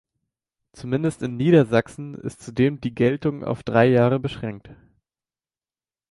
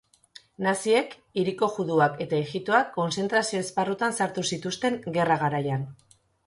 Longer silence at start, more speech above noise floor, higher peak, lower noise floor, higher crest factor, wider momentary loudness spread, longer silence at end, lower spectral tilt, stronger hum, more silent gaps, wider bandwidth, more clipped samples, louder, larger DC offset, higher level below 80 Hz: first, 0.75 s vs 0.6 s; first, over 69 dB vs 28 dB; first, -4 dBFS vs -8 dBFS; first, under -90 dBFS vs -54 dBFS; about the same, 20 dB vs 20 dB; first, 16 LU vs 6 LU; first, 1.4 s vs 0.5 s; first, -7.5 dB/octave vs -4.5 dB/octave; neither; neither; about the same, 11.5 kHz vs 11.5 kHz; neither; first, -21 LUFS vs -26 LUFS; neither; first, -54 dBFS vs -66 dBFS